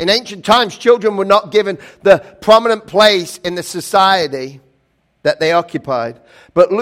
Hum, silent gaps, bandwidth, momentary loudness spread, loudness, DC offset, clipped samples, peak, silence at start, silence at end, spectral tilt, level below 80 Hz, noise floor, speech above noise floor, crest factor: none; none; 16.5 kHz; 11 LU; -14 LUFS; under 0.1%; 0.6%; 0 dBFS; 0 s; 0 s; -3.5 dB/octave; -52 dBFS; -61 dBFS; 47 dB; 14 dB